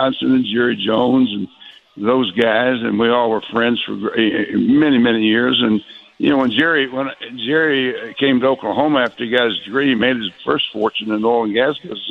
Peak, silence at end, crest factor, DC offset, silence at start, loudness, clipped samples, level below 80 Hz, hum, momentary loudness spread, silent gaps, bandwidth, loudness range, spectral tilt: 0 dBFS; 0 s; 16 dB; under 0.1%; 0 s; -16 LUFS; under 0.1%; -56 dBFS; none; 6 LU; none; 5.2 kHz; 2 LU; -7 dB/octave